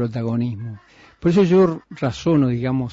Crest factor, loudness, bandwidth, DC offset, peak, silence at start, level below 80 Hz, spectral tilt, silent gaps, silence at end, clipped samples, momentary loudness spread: 12 dB; -19 LUFS; 7.8 kHz; under 0.1%; -8 dBFS; 0 s; -48 dBFS; -8 dB/octave; none; 0 s; under 0.1%; 11 LU